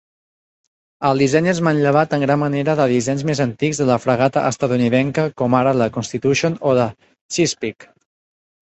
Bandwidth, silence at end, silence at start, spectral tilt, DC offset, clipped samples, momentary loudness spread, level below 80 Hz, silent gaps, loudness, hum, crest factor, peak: 8.4 kHz; 0.9 s; 1 s; -5.5 dB/octave; under 0.1%; under 0.1%; 5 LU; -54 dBFS; 7.21-7.29 s; -18 LUFS; none; 16 dB; -2 dBFS